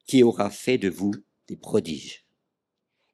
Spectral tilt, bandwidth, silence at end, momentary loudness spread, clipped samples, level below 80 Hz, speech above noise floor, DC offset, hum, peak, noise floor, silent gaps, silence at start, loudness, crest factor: -5.5 dB/octave; 14.5 kHz; 1 s; 21 LU; under 0.1%; -66 dBFS; 58 dB; under 0.1%; none; -6 dBFS; -82 dBFS; none; 0.1 s; -24 LUFS; 20 dB